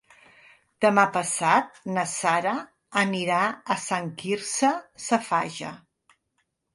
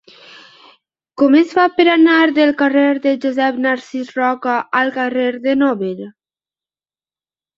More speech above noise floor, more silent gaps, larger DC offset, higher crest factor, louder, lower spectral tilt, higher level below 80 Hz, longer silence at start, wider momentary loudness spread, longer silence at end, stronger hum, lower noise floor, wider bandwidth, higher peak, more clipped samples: second, 51 dB vs over 76 dB; neither; neither; first, 22 dB vs 16 dB; second, -25 LUFS vs -15 LUFS; second, -3.5 dB/octave vs -5.5 dB/octave; second, -72 dBFS vs -64 dBFS; second, 0.8 s vs 1.2 s; about the same, 9 LU vs 10 LU; second, 0.95 s vs 1.45 s; neither; second, -75 dBFS vs under -90 dBFS; first, 11.5 kHz vs 7.4 kHz; second, -4 dBFS vs 0 dBFS; neither